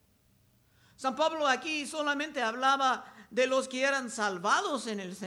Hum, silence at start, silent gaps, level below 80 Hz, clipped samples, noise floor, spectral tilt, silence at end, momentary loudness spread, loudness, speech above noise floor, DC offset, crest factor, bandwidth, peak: none; 1 s; none; -76 dBFS; under 0.1%; -67 dBFS; -2.5 dB/octave; 0 s; 8 LU; -30 LUFS; 37 dB; under 0.1%; 18 dB; 15.5 kHz; -14 dBFS